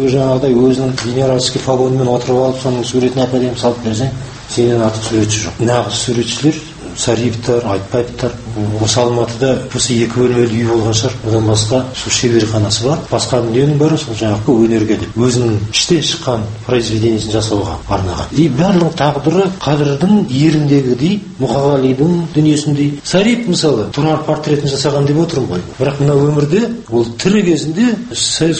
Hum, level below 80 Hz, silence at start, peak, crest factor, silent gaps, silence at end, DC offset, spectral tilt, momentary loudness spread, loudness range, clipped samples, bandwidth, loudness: none; -38 dBFS; 0 s; 0 dBFS; 14 dB; none; 0 s; under 0.1%; -5.5 dB/octave; 5 LU; 2 LU; under 0.1%; 8.8 kHz; -14 LUFS